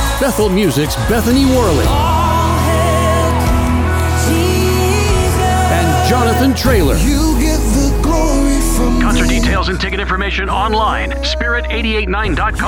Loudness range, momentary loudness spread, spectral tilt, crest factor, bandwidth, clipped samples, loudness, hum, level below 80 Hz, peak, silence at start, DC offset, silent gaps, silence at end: 2 LU; 4 LU; -5 dB/octave; 12 dB; 19 kHz; under 0.1%; -13 LUFS; none; -18 dBFS; 0 dBFS; 0 s; under 0.1%; none; 0 s